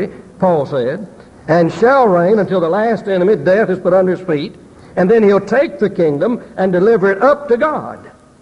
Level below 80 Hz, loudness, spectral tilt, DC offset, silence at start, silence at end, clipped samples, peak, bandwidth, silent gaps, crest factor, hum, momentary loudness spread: -50 dBFS; -14 LUFS; -8 dB/octave; under 0.1%; 0 s; 0.35 s; under 0.1%; -2 dBFS; 9.4 kHz; none; 12 dB; none; 11 LU